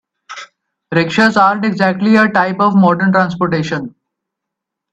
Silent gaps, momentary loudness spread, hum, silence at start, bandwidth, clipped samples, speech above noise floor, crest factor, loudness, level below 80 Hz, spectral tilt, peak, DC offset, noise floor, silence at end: none; 21 LU; none; 0.3 s; 8.2 kHz; under 0.1%; 67 dB; 14 dB; -13 LUFS; -56 dBFS; -6.5 dB/octave; 0 dBFS; under 0.1%; -80 dBFS; 1.05 s